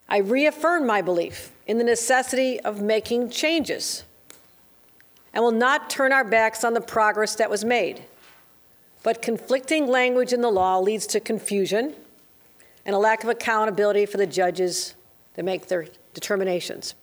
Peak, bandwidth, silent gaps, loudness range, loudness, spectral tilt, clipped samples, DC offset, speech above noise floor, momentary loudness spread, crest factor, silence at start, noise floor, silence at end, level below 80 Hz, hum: -6 dBFS; over 20 kHz; none; 3 LU; -23 LUFS; -3 dB/octave; under 0.1%; under 0.1%; 33 dB; 9 LU; 16 dB; 0.1 s; -55 dBFS; 0.1 s; -66 dBFS; none